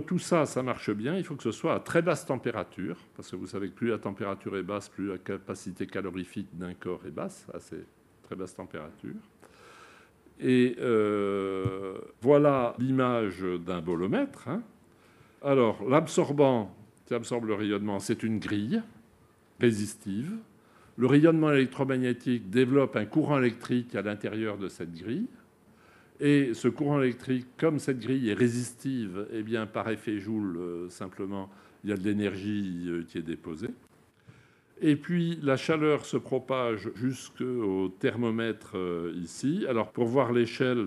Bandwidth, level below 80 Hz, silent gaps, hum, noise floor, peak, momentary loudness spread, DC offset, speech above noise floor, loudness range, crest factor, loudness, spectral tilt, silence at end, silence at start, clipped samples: 13 kHz; -68 dBFS; none; none; -61 dBFS; -6 dBFS; 14 LU; under 0.1%; 32 dB; 9 LU; 22 dB; -29 LUFS; -6.5 dB/octave; 0 s; 0 s; under 0.1%